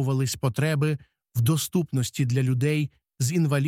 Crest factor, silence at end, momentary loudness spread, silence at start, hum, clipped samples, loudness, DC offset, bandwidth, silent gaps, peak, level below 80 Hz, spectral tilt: 14 dB; 0 s; 6 LU; 0 s; none; under 0.1%; -25 LUFS; under 0.1%; 16.5 kHz; none; -10 dBFS; -58 dBFS; -6 dB/octave